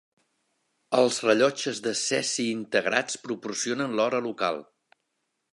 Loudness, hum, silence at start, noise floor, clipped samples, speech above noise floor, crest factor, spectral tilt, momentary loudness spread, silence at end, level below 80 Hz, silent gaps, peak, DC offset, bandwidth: -26 LUFS; none; 0.9 s; -79 dBFS; under 0.1%; 53 dB; 24 dB; -2.5 dB/octave; 8 LU; 0.9 s; -78 dBFS; none; -4 dBFS; under 0.1%; 11.5 kHz